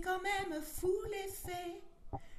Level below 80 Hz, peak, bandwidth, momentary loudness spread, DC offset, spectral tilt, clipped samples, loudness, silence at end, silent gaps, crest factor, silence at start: -54 dBFS; -26 dBFS; 13.5 kHz; 14 LU; under 0.1%; -4 dB/octave; under 0.1%; -39 LUFS; 0 s; none; 14 dB; 0 s